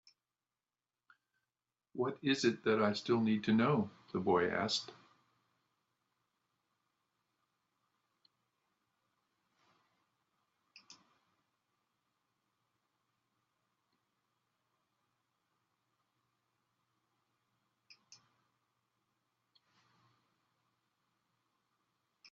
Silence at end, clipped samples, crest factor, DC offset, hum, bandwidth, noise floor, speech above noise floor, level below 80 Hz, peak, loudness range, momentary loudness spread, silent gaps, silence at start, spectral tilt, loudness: 17.4 s; under 0.1%; 24 dB; under 0.1%; none; 7.6 kHz; under -90 dBFS; over 57 dB; -82 dBFS; -18 dBFS; 6 LU; 8 LU; none; 1.95 s; -4 dB/octave; -34 LUFS